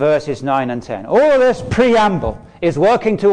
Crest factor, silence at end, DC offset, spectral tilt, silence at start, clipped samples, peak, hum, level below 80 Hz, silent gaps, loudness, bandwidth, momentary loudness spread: 10 dB; 0 s; under 0.1%; -6.5 dB/octave; 0 s; under 0.1%; -4 dBFS; none; -38 dBFS; none; -15 LUFS; 10 kHz; 10 LU